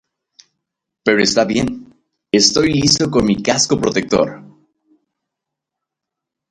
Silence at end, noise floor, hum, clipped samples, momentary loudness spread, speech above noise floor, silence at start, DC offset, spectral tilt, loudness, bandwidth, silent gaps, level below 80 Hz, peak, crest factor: 2.05 s; -82 dBFS; none; under 0.1%; 9 LU; 68 dB; 1.05 s; under 0.1%; -3.5 dB/octave; -15 LUFS; 11 kHz; none; -44 dBFS; 0 dBFS; 18 dB